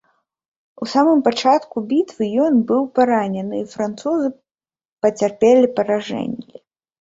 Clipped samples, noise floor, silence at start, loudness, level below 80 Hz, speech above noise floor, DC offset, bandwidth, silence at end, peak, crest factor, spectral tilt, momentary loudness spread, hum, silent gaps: under 0.1%; under -90 dBFS; 0.8 s; -18 LUFS; -62 dBFS; over 73 dB; under 0.1%; 7.8 kHz; 0.6 s; -2 dBFS; 16 dB; -6 dB/octave; 11 LU; none; 4.92-4.97 s